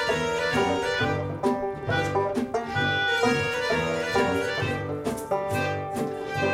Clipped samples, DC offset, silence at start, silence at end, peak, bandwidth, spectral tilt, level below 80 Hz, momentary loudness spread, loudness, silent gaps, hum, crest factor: under 0.1%; under 0.1%; 0 s; 0 s; -10 dBFS; 16 kHz; -5 dB/octave; -52 dBFS; 6 LU; -26 LUFS; none; none; 16 dB